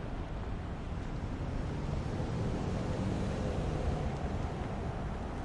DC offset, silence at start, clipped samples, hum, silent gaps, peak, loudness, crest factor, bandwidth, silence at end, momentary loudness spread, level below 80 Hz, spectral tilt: under 0.1%; 0 s; under 0.1%; none; none; -22 dBFS; -37 LUFS; 14 dB; 11 kHz; 0 s; 5 LU; -40 dBFS; -7.5 dB/octave